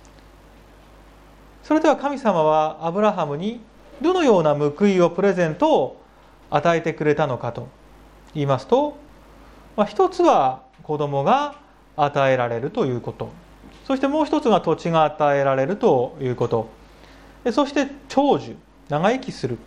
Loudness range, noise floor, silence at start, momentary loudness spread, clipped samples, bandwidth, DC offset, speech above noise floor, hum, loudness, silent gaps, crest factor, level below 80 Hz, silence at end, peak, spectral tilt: 4 LU; -49 dBFS; 1.65 s; 12 LU; under 0.1%; 11 kHz; under 0.1%; 29 dB; none; -21 LUFS; none; 18 dB; -52 dBFS; 0.05 s; -4 dBFS; -6.5 dB/octave